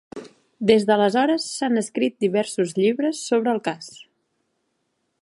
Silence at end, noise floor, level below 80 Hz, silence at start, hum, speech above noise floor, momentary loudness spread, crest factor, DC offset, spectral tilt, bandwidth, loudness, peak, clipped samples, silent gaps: 1.25 s; -73 dBFS; -68 dBFS; 0.15 s; none; 52 dB; 13 LU; 20 dB; under 0.1%; -4.5 dB/octave; 11.5 kHz; -21 LUFS; -4 dBFS; under 0.1%; none